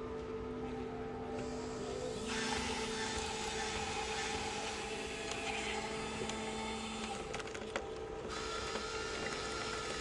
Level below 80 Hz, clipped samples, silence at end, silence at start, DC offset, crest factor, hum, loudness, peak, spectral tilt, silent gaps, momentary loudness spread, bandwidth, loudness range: -56 dBFS; under 0.1%; 0 s; 0 s; under 0.1%; 18 dB; none; -40 LUFS; -22 dBFS; -3 dB/octave; none; 5 LU; 11.5 kHz; 3 LU